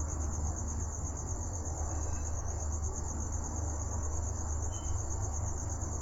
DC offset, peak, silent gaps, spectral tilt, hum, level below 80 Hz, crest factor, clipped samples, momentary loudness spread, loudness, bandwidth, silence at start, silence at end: under 0.1%; -22 dBFS; none; -5 dB/octave; none; -40 dBFS; 12 dB; under 0.1%; 2 LU; -37 LUFS; 8 kHz; 0 s; 0 s